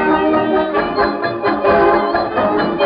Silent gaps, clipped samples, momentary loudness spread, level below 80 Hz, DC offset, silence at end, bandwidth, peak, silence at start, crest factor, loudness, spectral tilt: none; under 0.1%; 5 LU; -42 dBFS; under 0.1%; 0 s; 5.2 kHz; -2 dBFS; 0 s; 12 dB; -15 LUFS; -3.5 dB/octave